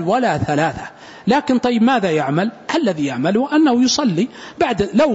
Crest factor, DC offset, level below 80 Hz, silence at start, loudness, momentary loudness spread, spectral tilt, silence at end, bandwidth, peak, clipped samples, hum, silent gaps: 14 dB; under 0.1%; -50 dBFS; 0 s; -17 LUFS; 7 LU; -5 dB/octave; 0 s; 8 kHz; -4 dBFS; under 0.1%; none; none